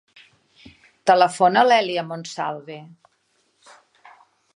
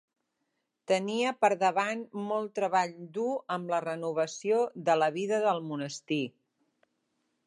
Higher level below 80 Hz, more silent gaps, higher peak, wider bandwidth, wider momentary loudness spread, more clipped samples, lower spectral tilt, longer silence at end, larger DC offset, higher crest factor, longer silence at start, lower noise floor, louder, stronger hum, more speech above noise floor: first, -72 dBFS vs -86 dBFS; neither; first, -2 dBFS vs -10 dBFS; about the same, 11 kHz vs 11.5 kHz; first, 19 LU vs 8 LU; neither; about the same, -4 dB/octave vs -4.5 dB/octave; first, 1.7 s vs 1.15 s; neither; about the same, 20 dB vs 20 dB; first, 1.05 s vs 0.9 s; second, -67 dBFS vs -81 dBFS; first, -19 LUFS vs -30 LUFS; neither; second, 48 dB vs 52 dB